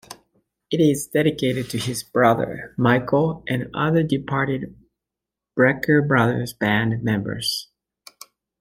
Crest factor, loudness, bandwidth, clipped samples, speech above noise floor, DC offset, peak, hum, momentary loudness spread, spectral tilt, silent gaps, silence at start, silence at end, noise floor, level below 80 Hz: 18 dB; -21 LUFS; 16.5 kHz; under 0.1%; 66 dB; under 0.1%; -2 dBFS; none; 8 LU; -5.5 dB/octave; none; 0.1 s; 0.95 s; -86 dBFS; -54 dBFS